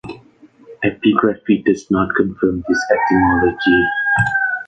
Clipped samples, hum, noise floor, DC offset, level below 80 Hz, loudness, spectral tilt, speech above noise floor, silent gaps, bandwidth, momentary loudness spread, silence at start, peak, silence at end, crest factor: under 0.1%; none; -47 dBFS; under 0.1%; -40 dBFS; -16 LUFS; -6 dB/octave; 31 dB; none; 8.8 kHz; 5 LU; 0.05 s; -2 dBFS; 0.05 s; 14 dB